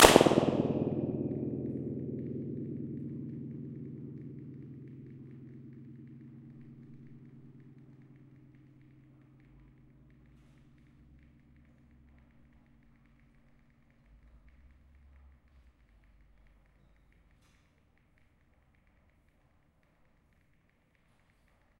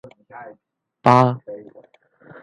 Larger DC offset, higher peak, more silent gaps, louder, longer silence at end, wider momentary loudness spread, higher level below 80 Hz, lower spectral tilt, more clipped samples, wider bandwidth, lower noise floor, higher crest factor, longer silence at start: neither; about the same, -2 dBFS vs 0 dBFS; neither; second, -33 LUFS vs -16 LUFS; first, 14 s vs 0.85 s; about the same, 25 LU vs 26 LU; first, -58 dBFS vs -64 dBFS; second, -4 dB/octave vs -8 dB/octave; neither; first, 15.5 kHz vs 10.5 kHz; first, -70 dBFS vs -52 dBFS; first, 36 dB vs 22 dB; second, 0 s vs 0.35 s